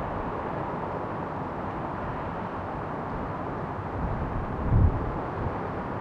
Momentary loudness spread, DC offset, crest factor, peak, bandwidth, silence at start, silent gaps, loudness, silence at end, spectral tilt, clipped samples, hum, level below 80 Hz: 8 LU; under 0.1%; 20 dB; -10 dBFS; 6.4 kHz; 0 s; none; -31 LUFS; 0 s; -9.5 dB/octave; under 0.1%; none; -36 dBFS